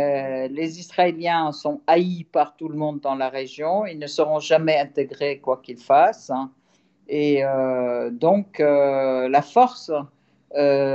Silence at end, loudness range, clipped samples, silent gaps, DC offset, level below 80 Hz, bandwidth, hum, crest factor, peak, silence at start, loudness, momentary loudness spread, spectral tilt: 0 s; 3 LU; under 0.1%; none; under 0.1%; -78 dBFS; 8 kHz; none; 16 dB; -4 dBFS; 0 s; -22 LUFS; 10 LU; -6 dB/octave